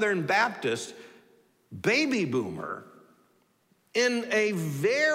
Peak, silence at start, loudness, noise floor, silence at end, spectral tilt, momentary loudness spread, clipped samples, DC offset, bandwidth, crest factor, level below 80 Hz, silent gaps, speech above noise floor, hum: -12 dBFS; 0 s; -27 LUFS; -68 dBFS; 0 s; -4.5 dB/octave; 13 LU; under 0.1%; under 0.1%; 16 kHz; 16 dB; -76 dBFS; none; 41 dB; none